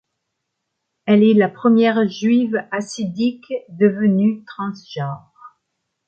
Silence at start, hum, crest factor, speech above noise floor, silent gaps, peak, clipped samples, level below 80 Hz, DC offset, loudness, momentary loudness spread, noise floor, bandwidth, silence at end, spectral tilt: 1.05 s; none; 16 dB; 59 dB; none; -2 dBFS; under 0.1%; -66 dBFS; under 0.1%; -18 LUFS; 14 LU; -77 dBFS; 8.8 kHz; 0.6 s; -7 dB/octave